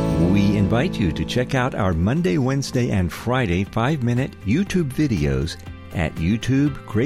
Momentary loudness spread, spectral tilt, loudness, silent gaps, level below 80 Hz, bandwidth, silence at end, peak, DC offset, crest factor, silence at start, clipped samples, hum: 5 LU; -7 dB/octave; -21 LUFS; none; -36 dBFS; 15.5 kHz; 0 s; -6 dBFS; under 0.1%; 14 dB; 0 s; under 0.1%; none